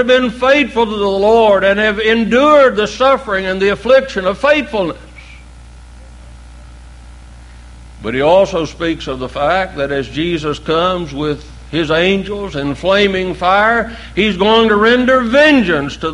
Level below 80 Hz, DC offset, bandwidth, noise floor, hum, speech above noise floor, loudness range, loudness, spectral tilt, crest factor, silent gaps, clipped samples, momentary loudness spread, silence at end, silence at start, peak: -36 dBFS; under 0.1%; 11.5 kHz; -36 dBFS; none; 23 dB; 8 LU; -13 LUFS; -5.5 dB/octave; 14 dB; none; under 0.1%; 11 LU; 0 s; 0 s; 0 dBFS